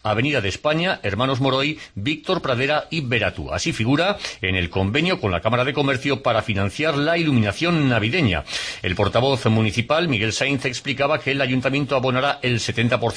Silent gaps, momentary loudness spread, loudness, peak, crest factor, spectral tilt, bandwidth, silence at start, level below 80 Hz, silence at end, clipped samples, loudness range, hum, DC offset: none; 5 LU; -21 LUFS; -4 dBFS; 16 dB; -5.5 dB/octave; 10.5 kHz; 0.05 s; -46 dBFS; 0 s; under 0.1%; 2 LU; none; under 0.1%